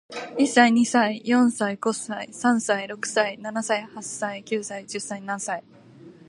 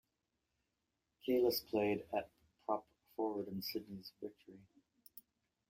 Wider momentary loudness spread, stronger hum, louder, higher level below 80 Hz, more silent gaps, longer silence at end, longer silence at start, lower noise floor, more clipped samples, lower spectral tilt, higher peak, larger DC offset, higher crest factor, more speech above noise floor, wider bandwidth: second, 14 LU vs 23 LU; neither; first, -24 LUFS vs -40 LUFS; about the same, -76 dBFS vs -76 dBFS; neither; second, 0.15 s vs 0.5 s; second, 0.1 s vs 1.25 s; second, -47 dBFS vs -87 dBFS; neither; second, -3.5 dB/octave vs -5 dB/octave; first, -2 dBFS vs -22 dBFS; neither; about the same, 22 dB vs 20 dB; second, 24 dB vs 48 dB; second, 11.5 kHz vs 16 kHz